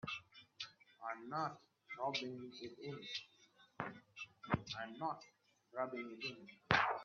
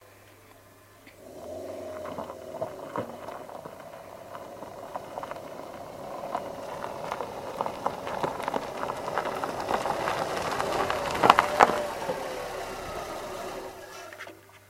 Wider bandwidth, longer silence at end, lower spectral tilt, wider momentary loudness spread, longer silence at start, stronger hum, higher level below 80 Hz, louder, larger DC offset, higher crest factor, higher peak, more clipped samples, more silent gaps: second, 7 kHz vs 16 kHz; about the same, 0 s vs 0 s; second, -2.5 dB/octave vs -4 dB/octave; second, 12 LU vs 19 LU; about the same, 0.05 s vs 0 s; neither; second, -72 dBFS vs -58 dBFS; second, -44 LUFS vs -30 LUFS; neither; about the same, 32 dB vs 32 dB; second, -14 dBFS vs 0 dBFS; neither; neither